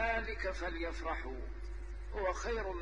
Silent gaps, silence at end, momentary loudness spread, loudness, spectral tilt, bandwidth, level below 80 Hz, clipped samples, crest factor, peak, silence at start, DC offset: none; 0 s; 11 LU; -40 LUFS; -5 dB/octave; 9.8 kHz; -44 dBFS; under 0.1%; 16 dB; -22 dBFS; 0 s; 0.2%